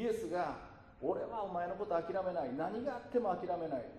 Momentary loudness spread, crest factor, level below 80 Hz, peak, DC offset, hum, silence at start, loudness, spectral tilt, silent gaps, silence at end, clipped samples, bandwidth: 5 LU; 16 dB; -66 dBFS; -22 dBFS; under 0.1%; none; 0 s; -38 LUFS; -7 dB/octave; none; 0 s; under 0.1%; 13 kHz